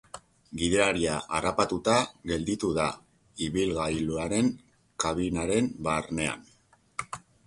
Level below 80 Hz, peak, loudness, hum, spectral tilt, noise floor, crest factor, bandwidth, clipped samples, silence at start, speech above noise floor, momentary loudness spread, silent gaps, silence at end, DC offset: -50 dBFS; -8 dBFS; -28 LUFS; none; -4.5 dB/octave; -48 dBFS; 20 dB; 11.5 kHz; under 0.1%; 0.15 s; 21 dB; 18 LU; none; 0.25 s; under 0.1%